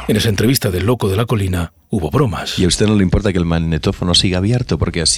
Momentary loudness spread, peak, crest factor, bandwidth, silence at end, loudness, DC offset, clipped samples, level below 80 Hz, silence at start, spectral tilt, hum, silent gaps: 5 LU; -2 dBFS; 14 dB; 16.5 kHz; 0 s; -16 LUFS; under 0.1%; under 0.1%; -30 dBFS; 0 s; -5 dB/octave; none; none